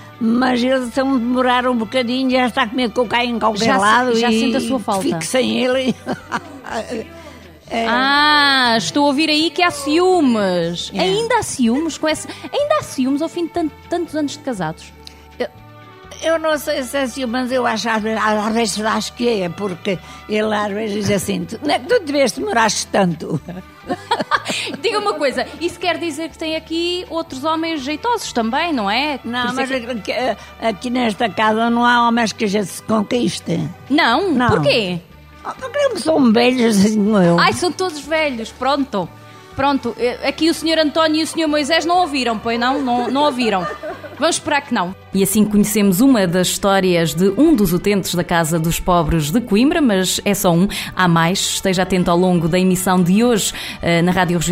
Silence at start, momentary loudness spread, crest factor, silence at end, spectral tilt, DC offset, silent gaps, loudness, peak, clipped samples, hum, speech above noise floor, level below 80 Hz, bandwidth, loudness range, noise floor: 0 s; 10 LU; 16 dB; 0 s; -4.5 dB/octave; under 0.1%; none; -17 LUFS; 0 dBFS; under 0.1%; none; 23 dB; -42 dBFS; 16 kHz; 6 LU; -40 dBFS